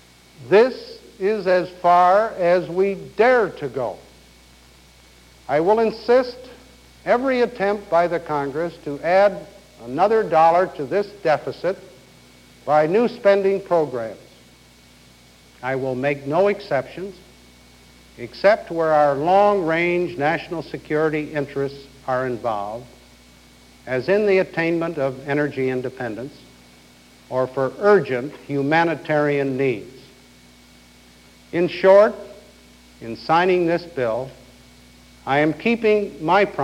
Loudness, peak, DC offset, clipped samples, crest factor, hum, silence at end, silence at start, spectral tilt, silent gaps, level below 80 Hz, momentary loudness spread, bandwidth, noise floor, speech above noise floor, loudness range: -20 LUFS; 0 dBFS; under 0.1%; under 0.1%; 20 dB; none; 0 s; 0.4 s; -6.5 dB/octave; none; -54 dBFS; 15 LU; 14 kHz; -50 dBFS; 30 dB; 6 LU